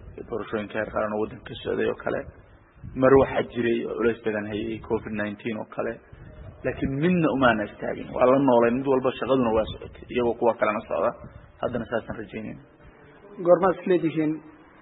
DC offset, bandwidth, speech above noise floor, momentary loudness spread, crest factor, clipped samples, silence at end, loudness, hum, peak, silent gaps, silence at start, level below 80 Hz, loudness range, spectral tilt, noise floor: under 0.1%; 4 kHz; 26 dB; 15 LU; 20 dB; under 0.1%; 0.3 s; -25 LUFS; none; -4 dBFS; none; 0 s; -50 dBFS; 6 LU; -11 dB/octave; -50 dBFS